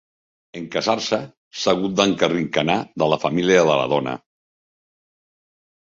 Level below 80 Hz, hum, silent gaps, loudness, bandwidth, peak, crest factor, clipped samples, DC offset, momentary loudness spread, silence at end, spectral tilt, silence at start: -58 dBFS; none; 1.37-1.51 s; -20 LUFS; 7.8 kHz; -2 dBFS; 20 dB; under 0.1%; under 0.1%; 14 LU; 1.65 s; -4.5 dB/octave; 0.55 s